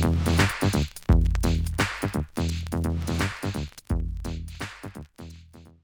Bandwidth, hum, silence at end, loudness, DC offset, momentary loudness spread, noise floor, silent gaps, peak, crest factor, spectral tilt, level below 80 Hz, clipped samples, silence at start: over 20 kHz; none; 0.15 s; -27 LUFS; under 0.1%; 17 LU; -49 dBFS; none; -6 dBFS; 20 dB; -5.5 dB/octave; -32 dBFS; under 0.1%; 0 s